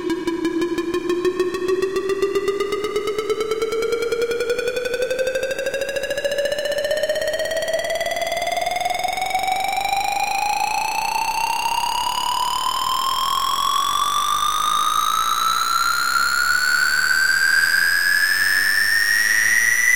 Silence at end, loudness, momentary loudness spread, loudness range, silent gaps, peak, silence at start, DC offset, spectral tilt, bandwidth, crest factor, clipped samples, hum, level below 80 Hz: 0 s; -19 LUFS; 7 LU; 6 LU; none; -6 dBFS; 0 s; 2%; -1 dB/octave; 17 kHz; 14 dB; under 0.1%; none; -52 dBFS